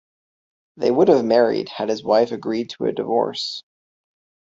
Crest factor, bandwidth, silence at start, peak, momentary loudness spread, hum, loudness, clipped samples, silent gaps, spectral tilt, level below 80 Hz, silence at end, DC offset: 18 dB; 7.8 kHz; 0.8 s; -2 dBFS; 10 LU; none; -20 LUFS; under 0.1%; none; -5.5 dB/octave; -64 dBFS; 0.9 s; under 0.1%